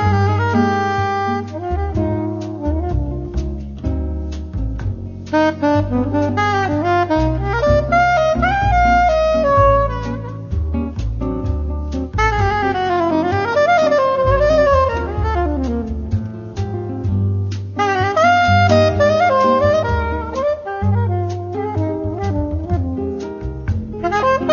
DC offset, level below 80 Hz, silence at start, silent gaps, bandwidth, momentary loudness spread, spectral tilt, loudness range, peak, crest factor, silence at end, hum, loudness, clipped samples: under 0.1%; -26 dBFS; 0 s; none; 7 kHz; 11 LU; -7 dB/octave; 7 LU; 0 dBFS; 16 dB; 0 s; none; -17 LUFS; under 0.1%